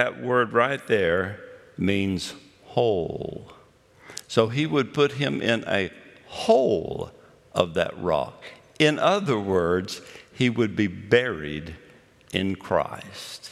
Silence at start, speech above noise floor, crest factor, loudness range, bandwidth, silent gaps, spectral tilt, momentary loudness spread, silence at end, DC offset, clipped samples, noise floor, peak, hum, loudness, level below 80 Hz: 0 s; 29 dB; 22 dB; 3 LU; 13.5 kHz; none; -5.5 dB/octave; 15 LU; 0 s; under 0.1%; under 0.1%; -53 dBFS; -2 dBFS; none; -24 LUFS; -58 dBFS